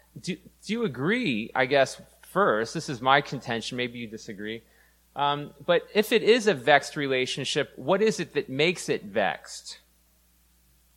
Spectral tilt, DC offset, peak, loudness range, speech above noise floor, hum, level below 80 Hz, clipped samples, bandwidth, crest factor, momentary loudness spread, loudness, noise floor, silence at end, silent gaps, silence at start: -4 dB/octave; under 0.1%; -2 dBFS; 4 LU; 37 dB; none; -64 dBFS; under 0.1%; 16.5 kHz; 24 dB; 16 LU; -26 LUFS; -63 dBFS; 1.2 s; none; 0.15 s